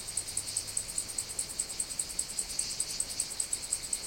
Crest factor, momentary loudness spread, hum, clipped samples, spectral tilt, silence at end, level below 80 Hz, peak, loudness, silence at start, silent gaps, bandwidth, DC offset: 22 dB; 2 LU; none; under 0.1%; 0.5 dB/octave; 0 s; -56 dBFS; -14 dBFS; -33 LUFS; 0 s; none; 17 kHz; under 0.1%